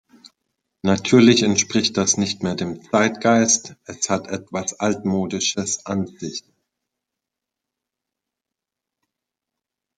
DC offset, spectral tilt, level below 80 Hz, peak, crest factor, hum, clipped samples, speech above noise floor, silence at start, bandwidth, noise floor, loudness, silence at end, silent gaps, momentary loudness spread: under 0.1%; -3.5 dB/octave; -64 dBFS; -2 dBFS; 20 dB; none; under 0.1%; 66 dB; 0.85 s; 9.4 kHz; -86 dBFS; -19 LUFS; 3.6 s; none; 14 LU